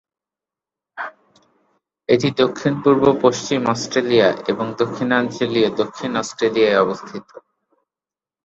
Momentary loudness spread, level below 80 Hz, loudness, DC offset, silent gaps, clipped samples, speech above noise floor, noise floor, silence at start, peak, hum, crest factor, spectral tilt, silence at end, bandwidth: 16 LU; -58 dBFS; -18 LUFS; under 0.1%; none; under 0.1%; over 72 dB; under -90 dBFS; 0.95 s; -2 dBFS; none; 18 dB; -5 dB/octave; 1.05 s; 8 kHz